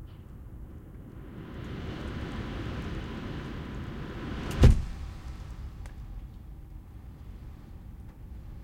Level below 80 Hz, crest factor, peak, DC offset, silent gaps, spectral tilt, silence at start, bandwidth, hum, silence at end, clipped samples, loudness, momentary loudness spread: -36 dBFS; 26 dB; -6 dBFS; under 0.1%; none; -7 dB/octave; 0 s; 13.5 kHz; none; 0 s; under 0.1%; -33 LUFS; 15 LU